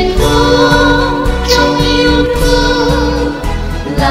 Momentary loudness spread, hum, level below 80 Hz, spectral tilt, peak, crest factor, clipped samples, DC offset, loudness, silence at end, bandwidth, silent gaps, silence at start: 9 LU; none; -18 dBFS; -5 dB/octave; 0 dBFS; 10 dB; 0.2%; under 0.1%; -11 LUFS; 0 s; 16.5 kHz; none; 0 s